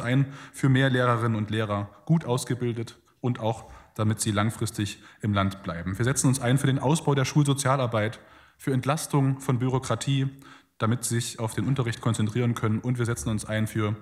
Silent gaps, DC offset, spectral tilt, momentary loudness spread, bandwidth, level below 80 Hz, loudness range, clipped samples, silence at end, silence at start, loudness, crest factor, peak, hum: none; under 0.1%; -5.5 dB/octave; 9 LU; 15 kHz; -56 dBFS; 4 LU; under 0.1%; 0 s; 0 s; -26 LUFS; 16 dB; -8 dBFS; none